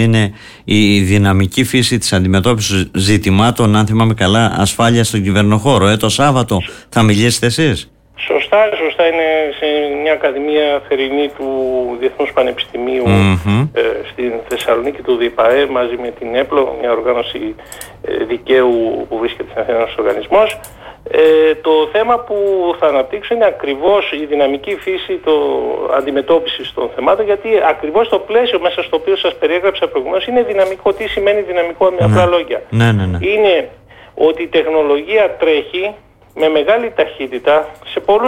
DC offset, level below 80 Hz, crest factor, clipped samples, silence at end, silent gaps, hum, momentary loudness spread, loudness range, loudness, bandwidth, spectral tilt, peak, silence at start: under 0.1%; -42 dBFS; 10 dB; under 0.1%; 0 s; none; none; 8 LU; 3 LU; -14 LUFS; 16.5 kHz; -5.5 dB/octave; -2 dBFS; 0 s